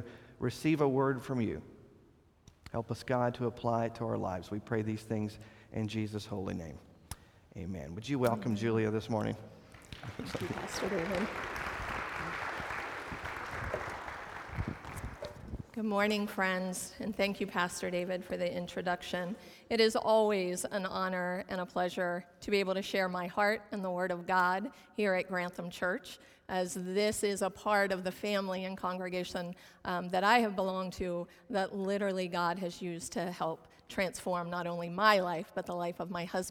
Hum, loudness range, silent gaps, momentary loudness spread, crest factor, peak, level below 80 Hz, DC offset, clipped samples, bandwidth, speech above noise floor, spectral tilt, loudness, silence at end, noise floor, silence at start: none; 5 LU; none; 13 LU; 24 dB; -10 dBFS; -58 dBFS; under 0.1%; under 0.1%; 18.5 kHz; 30 dB; -5 dB/octave; -34 LUFS; 0 s; -64 dBFS; 0 s